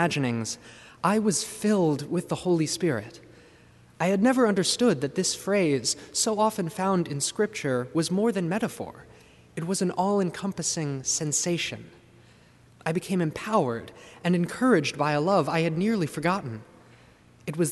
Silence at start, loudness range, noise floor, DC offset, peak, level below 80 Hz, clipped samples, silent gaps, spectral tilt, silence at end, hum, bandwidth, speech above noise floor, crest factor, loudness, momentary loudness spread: 0 s; 4 LU; -55 dBFS; under 0.1%; -8 dBFS; -64 dBFS; under 0.1%; none; -4.5 dB/octave; 0 s; none; 12 kHz; 30 dB; 18 dB; -26 LUFS; 11 LU